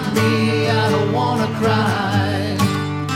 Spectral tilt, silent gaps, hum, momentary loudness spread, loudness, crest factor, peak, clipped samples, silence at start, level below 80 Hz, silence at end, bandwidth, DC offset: -6 dB/octave; none; none; 3 LU; -18 LUFS; 12 dB; -4 dBFS; under 0.1%; 0 s; -52 dBFS; 0 s; 16 kHz; under 0.1%